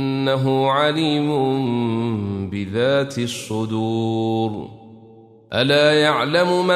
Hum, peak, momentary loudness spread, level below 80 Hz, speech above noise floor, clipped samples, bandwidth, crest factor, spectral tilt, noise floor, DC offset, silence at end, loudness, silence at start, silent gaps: none; -4 dBFS; 10 LU; -60 dBFS; 27 dB; under 0.1%; 13.5 kHz; 16 dB; -5.5 dB/octave; -46 dBFS; under 0.1%; 0 s; -19 LUFS; 0 s; none